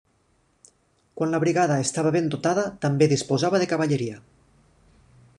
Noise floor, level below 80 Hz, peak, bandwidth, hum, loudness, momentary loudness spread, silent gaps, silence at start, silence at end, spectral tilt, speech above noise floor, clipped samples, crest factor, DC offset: -65 dBFS; -62 dBFS; -6 dBFS; 11 kHz; none; -23 LUFS; 6 LU; none; 1.15 s; 1.2 s; -5.5 dB/octave; 43 dB; under 0.1%; 18 dB; under 0.1%